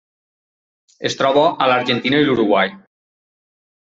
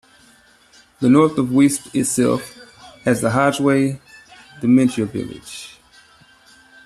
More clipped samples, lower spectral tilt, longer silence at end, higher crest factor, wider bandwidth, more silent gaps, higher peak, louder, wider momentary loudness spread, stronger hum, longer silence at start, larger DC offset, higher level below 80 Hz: neither; about the same, -5 dB/octave vs -5.5 dB/octave; about the same, 1.05 s vs 1.15 s; about the same, 18 dB vs 16 dB; second, 7.8 kHz vs 13.5 kHz; neither; about the same, -2 dBFS vs -2 dBFS; about the same, -16 LUFS vs -17 LUFS; second, 8 LU vs 19 LU; neither; about the same, 1 s vs 1 s; neither; about the same, -60 dBFS vs -56 dBFS